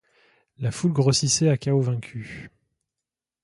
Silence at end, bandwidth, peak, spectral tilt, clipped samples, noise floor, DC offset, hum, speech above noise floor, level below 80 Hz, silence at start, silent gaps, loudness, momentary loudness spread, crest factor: 0.95 s; 11.5 kHz; -6 dBFS; -5 dB/octave; under 0.1%; -88 dBFS; under 0.1%; none; 65 dB; -56 dBFS; 0.6 s; none; -22 LUFS; 17 LU; 18 dB